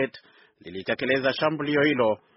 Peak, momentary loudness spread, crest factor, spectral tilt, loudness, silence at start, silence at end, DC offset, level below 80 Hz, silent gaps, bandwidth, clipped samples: -8 dBFS; 11 LU; 18 dB; -3 dB/octave; -24 LUFS; 0 s; 0.2 s; under 0.1%; -64 dBFS; none; 6 kHz; under 0.1%